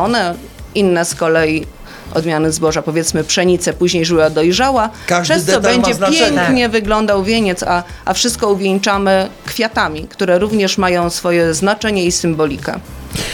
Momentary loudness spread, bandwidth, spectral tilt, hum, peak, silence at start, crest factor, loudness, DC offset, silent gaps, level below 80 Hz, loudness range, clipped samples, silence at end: 8 LU; 19 kHz; -4 dB/octave; none; 0 dBFS; 0 s; 14 dB; -14 LUFS; under 0.1%; none; -36 dBFS; 2 LU; under 0.1%; 0 s